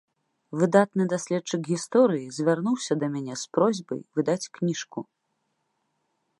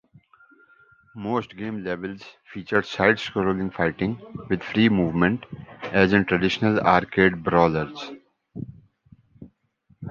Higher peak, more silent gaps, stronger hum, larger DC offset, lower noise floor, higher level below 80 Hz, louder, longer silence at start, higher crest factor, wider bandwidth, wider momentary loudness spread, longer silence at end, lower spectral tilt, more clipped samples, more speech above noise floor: about the same, -4 dBFS vs -2 dBFS; neither; neither; neither; first, -76 dBFS vs -62 dBFS; second, -78 dBFS vs -50 dBFS; second, -26 LUFS vs -22 LUFS; second, 0.5 s vs 1.15 s; about the same, 22 dB vs 22 dB; first, 11.5 kHz vs 7.2 kHz; second, 11 LU vs 19 LU; first, 1.35 s vs 0 s; second, -5.5 dB/octave vs -7 dB/octave; neither; first, 51 dB vs 40 dB